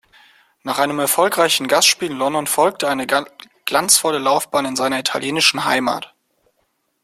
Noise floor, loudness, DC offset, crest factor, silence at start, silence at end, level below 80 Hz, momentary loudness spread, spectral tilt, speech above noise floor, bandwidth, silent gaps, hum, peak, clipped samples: -67 dBFS; -17 LUFS; under 0.1%; 18 dB; 0.65 s; 1 s; -62 dBFS; 10 LU; -1.5 dB/octave; 50 dB; 16.5 kHz; none; none; 0 dBFS; under 0.1%